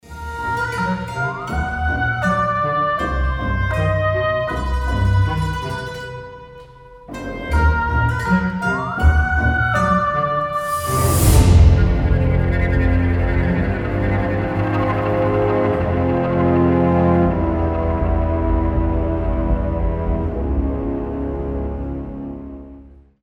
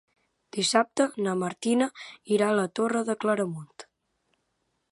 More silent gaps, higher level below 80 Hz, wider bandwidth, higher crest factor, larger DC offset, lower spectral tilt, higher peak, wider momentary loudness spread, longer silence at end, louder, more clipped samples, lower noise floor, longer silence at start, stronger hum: neither; first, -24 dBFS vs -76 dBFS; first, 18.5 kHz vs 11.5 kHz; about the same, 18 dB vs 22 dB; neither; first, -6.5 dB/octave vs -4 dB/octave; first, 0 dBFS vs -6 dBFS; about the same, 11 LU vs 12 LU; second, 0.35 s vs 1.1 s; first, -19 LUFS vs -26 LUFS; neither; second, -42 dBFS vs -76 dBFS; second, 0.05 s vs 0.55 s; neither